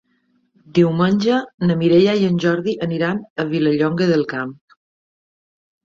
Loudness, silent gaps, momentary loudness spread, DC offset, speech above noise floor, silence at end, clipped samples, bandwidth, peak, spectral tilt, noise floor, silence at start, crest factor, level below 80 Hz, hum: -18 LUFS; 1.54-1.58 s, 3.30-3.36 s; 9 LU; under 0.1%; 46 dB; 1.3 s; under 0.1%; 7.4 kHz; -2 dBFS; -7.5 dB/octave; -63 dBFS; 0.75 s; 16 dB; -58 dBFS; none